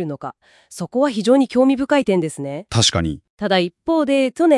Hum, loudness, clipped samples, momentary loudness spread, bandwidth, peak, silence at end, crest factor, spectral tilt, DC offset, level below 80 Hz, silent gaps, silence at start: none; -18 LUFS; under 0.1%; 13 LU; 12 kHz; -2 dBFS; 0 s; 16 dB; -4.5 dB/octave; under 0.1%; -48 dBFS; 3.30-3.37 s; 0 s